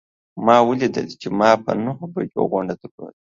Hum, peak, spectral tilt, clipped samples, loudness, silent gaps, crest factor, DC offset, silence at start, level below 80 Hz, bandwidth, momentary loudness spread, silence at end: none; 0 dBFS; -6.5 dB/octave; under 0.1%; -19 LUFS; 2.91-2.98 s; 20 dB; under 0.1%; 0.35 s; -60 dBFS; 7.6 kHz; 15 LU; 0.15 s